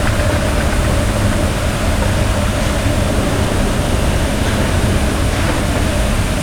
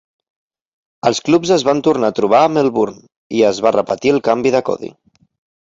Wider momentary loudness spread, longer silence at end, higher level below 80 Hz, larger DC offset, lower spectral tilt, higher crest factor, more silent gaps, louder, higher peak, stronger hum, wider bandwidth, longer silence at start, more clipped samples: second, 1 LU vs 9 LU; second, 0 s vs 0.7 s; first, -20 dBFS vs -56 dBFS; neither; about the same, -5 dB/octave vs -5 dB/octave; about the same, 12 dB vs 16 dB; second, none vs 3.16-3.30 s; about the same, -16 LUFS vs -15 LUFS; about the same, -2 dBFS vs 0 dBFS; neither; first, over 20 kHz vs 8 kHz; second, 0 s vs 1.05 s; neither